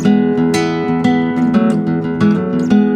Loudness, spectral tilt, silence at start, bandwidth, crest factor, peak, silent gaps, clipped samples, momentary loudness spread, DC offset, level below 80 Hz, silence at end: -14 LUFS; -7 dB/octave; 0 s; 11.5 kHz; 12 dB; -2 dBFS; none; under 0.1%; 3 LU; under 0.1%; -46 dBFS; 0 s